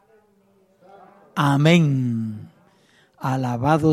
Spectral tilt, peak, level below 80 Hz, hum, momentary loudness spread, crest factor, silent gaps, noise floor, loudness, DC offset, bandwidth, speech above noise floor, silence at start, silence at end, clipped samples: -7 dB/octave; -2 dBFS; -56 dBFS; none; 15 LU; 20 dB; none; -59 dBFS; -20 LUFS; under 0.1%; 14 kHz; 42 dB; 1.35 s; 0 s; under 0.1%